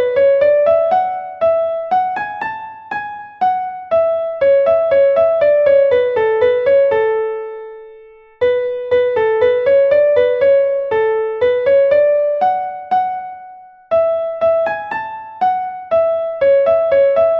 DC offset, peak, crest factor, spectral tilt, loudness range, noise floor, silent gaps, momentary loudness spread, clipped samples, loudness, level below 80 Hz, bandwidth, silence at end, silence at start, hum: under 0.1%; -2 dBFS; 12 dB; -6 dB/octave; 5 LU; -41 dBFS; none; 12 LU; under 0.1%; -15 LUFS; -54 dBFS; 5.6 kHz; 0 s; 0 s; none